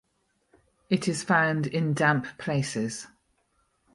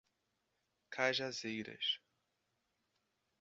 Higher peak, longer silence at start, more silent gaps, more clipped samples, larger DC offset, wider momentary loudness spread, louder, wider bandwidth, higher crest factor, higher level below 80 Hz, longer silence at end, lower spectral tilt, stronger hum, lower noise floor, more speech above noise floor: first, -8 dBFS vs -18 dBFS; about the same, 0.9 s vs 0.9 s; neither; neither; neither; about the same, 10 LU vs 8 LU; first, -26 LUFS vs -39 LUFS; first, 11.5 kHz vs 7.6 kHz; second, 20 dB vs 26 dB; first, -66 dBFS vs -84 dBFS; second, 0.9 s vs 1.45 s; first, -5.5 dB/octave vs -0.5 dB/octave; neither; second, -73 dBFS vs -84 dBFS; about the same, 47 dB vs 45 dB